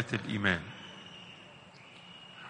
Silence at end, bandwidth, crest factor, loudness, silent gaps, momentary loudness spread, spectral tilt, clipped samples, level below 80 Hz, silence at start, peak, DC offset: 0 s; 10 kHz; 26 dB; -34 LUFS; none; 21 LU; -5 dB/octave; under 0.1%; -66 dBFS; 0 s; -12 dBFS; under 0.1%